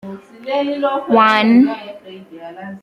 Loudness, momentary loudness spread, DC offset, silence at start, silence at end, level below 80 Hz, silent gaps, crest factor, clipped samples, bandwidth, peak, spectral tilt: -14 LUFS; 23 LU; under 0.1%; 0.05 s; 0.05 s; -64 dBFS; none; 16 dB; under 0.1%; 7.4 kHz; -2 dBFS; -6 dB/octave